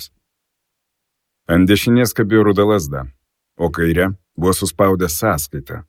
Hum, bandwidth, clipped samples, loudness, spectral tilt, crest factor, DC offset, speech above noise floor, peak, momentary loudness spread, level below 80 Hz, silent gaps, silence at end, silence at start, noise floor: none; 17.5 kHz; under 0.1%; -16 LUFS; -5.5 dB/octave; 16 dB; under 0.1%; 61 dB; 0 dBFS; 13 LU; -38 dBFS; none; 0.05 s; 0 s; -76 dBFS